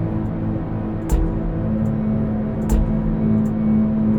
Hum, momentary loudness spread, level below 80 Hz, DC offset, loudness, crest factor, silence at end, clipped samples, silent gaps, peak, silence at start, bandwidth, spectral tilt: none; 6 LU; -26 dBFS; under 0.1%; -21 LUFS; 14 dB; 0 s; under 0.1%; none; -6 dBFS; 0 s; 15.5 kHz; -9 dB/octave